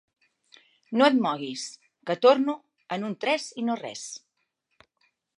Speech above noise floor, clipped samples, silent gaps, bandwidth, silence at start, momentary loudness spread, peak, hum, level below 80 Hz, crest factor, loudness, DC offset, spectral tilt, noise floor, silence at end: 52 dB; under 0.1%; none; 11 kHz; 0.9 s; 18 LU; -6 dBFS; none; -84 dBFS; 22 dB; -25 LUFS; under 0.1%; -4 dB/octave; -77 dBFS; 1.2 s